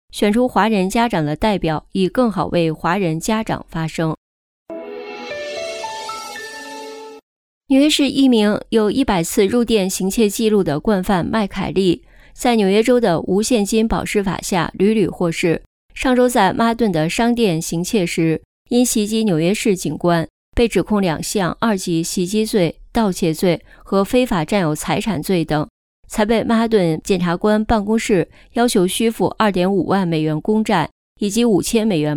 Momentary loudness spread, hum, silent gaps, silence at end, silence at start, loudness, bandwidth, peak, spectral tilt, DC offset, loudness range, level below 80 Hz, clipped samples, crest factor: 10 LU; none; 4.17-4.66 s, 7.23-7.61 s, 15.66-15.89 s, 18.45-18.65 s, 20.30-20.52 s, 25.70-26.03 s, 30.92-31.16 s; 0 s; 0.15 s; -18 LUFS; 18 kHz; -2 dBFS; -5 dB/octave; under 0.1%; 4 LU; -40 dBFS; under 0.1%; 14 dB